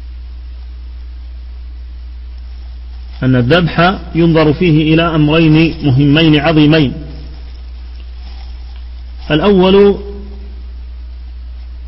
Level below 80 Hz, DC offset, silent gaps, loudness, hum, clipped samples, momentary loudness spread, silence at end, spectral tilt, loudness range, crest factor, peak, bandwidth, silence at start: -26 dBFS; under 0.1%; none; -10 LUFS; none; under 0.1%; 22 LU; 0 s; -9.5 dB/octave; 7 LU; 12 dB; 0 dBFS; 5.8 kHz; 0 s